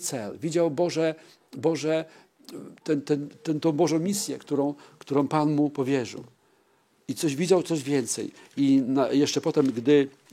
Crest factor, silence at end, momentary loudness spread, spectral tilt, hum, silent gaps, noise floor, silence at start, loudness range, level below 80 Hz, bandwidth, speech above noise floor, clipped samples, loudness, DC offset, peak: 18 dB; 0.25 s; 15 LU; -5.5 dB/octave; none; none; -65 dBFS; 0 s; 4 LU; -78 dBFS; 15.5 kHz; 40 dB; under 0.1%; -26 LUFS; under 0.1%; -8 dBFS